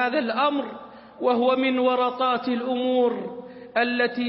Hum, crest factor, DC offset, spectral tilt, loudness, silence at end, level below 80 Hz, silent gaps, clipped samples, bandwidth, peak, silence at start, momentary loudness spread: none; 14 dB; under 0.1%; -9 dB/octave; -23 LUFS; 0 s; -70 dBFS; none; under 0.1%; 5.8 kHz; -8 dBFS; 0 s; 12 LU